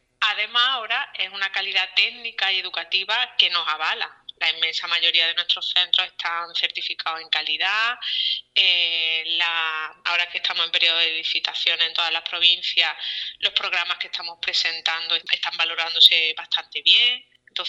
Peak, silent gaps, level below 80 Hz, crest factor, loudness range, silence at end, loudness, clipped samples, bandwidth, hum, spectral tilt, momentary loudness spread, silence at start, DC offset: 0 dBFS; none; -74 dBFS; 22 dB; 2 LU; 0 s; -20 LUFS; under 0.1%; 13 kHz; none; 1.5 dB/octave; 9 LU; 0.2 s; under 0.1%